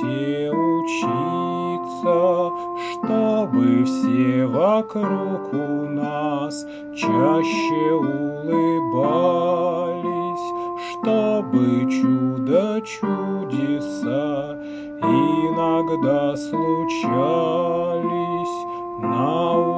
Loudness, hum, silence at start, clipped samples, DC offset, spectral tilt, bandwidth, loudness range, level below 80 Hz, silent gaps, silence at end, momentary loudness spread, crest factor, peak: -21 LUFS; none; 0 s; under 0.1%; under 0.1%; -7 dB/octave; 8 kHz; 2 LU; -62 dBFS; none; 0 s; 8 LU; 16 dB; -6 dBFS